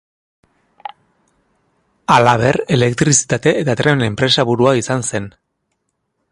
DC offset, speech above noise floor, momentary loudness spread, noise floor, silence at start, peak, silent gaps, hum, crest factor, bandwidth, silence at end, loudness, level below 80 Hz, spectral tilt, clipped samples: under 0.1%; 56 dB; 22 LU; -70 dBFS; 2.1 s; 0 dBFS; none; none; 16 dB; 11.5 kHz; 1 s; -14 LUFS; -48 dBFS; -4 dB/octave; under 0.1%